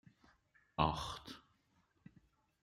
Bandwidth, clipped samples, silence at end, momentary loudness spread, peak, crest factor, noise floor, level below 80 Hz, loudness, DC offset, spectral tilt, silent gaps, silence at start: 14 kHz; under 0.1%; 1.2 s; 18 LU; -16 dBFS; 30 dB; -77 dBFS; -60 dBFS; -40 LUFS; under 0.1%; -5.5 dB/octave; none; 0.8 s